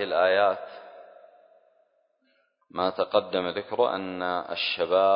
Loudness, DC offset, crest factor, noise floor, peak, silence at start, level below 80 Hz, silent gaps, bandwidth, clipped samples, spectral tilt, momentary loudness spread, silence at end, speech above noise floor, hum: -26 LUFS; under 0.1%; 20 dB; -70 dBFS; -8 dBFS; 0 s; -66 dBFS; none; 5.4 kHz; under 0.1%; -8 dB/octave; 15 LU; 0 s; 44 dB; none